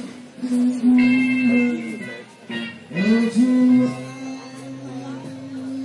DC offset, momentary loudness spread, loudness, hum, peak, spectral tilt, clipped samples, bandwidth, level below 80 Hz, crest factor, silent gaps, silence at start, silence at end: under 0.1%; 18 LU; -19 LUFS; none; -8 dBFS; -6 dB/octave; under 0.1%; 11 kHz; -64 dBFS; 12 dB; none; 0 s; 0 s